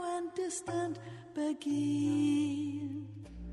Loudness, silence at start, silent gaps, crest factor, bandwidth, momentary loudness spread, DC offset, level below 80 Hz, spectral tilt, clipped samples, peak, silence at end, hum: -35 LUFS; 0 s; none; 12 dB; 11.5 kHz; 13 LU; under 0.1%; -60 dBFS; -5.5 dB/octave; under 0.1%; -22 dBFS; 0 s; none